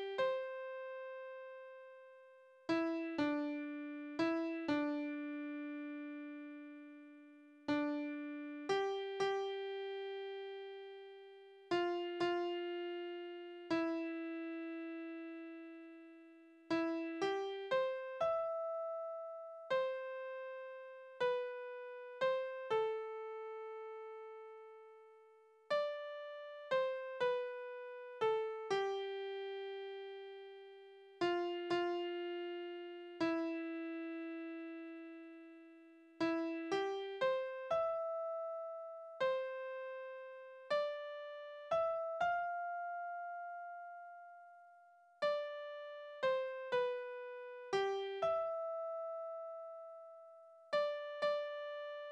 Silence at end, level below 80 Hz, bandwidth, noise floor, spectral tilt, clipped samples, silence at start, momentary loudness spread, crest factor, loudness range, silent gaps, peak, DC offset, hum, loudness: 0 s; -84 dBFS; 9.2 kHz; -65 dBFS; -5 dB/octave; under 0.1%; 0 s; 17 LU; 16 dB; 4 LU; none; -24 dBFS; under 0.1%; none; -41 LUFS